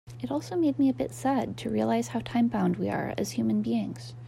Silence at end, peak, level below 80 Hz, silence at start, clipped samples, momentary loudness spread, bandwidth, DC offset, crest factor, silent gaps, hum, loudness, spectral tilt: 0 s; -16 dBFS; -60 dBFS; 0.05 s; under 0.1%; 6 LU; 14 kHz; under 0.1%; 12 dB; none; none; -28 LUFS; -6.5 dB/octave